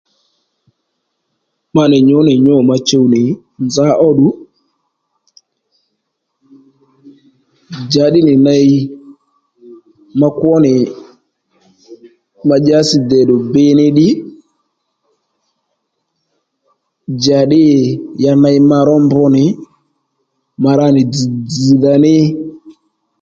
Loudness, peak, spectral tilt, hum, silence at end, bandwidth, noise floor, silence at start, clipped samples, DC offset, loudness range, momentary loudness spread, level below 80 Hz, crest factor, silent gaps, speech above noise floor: -10 LUFS; 0 dBFS; -7 dB/octave; none; 0.5 s; 7.8 kHz; -70 dBFS; 1.75 s; under 0.1%; under 0.1%; 6 LU; 11 LU; -52 dBFS; 12 dB; none; 61 dB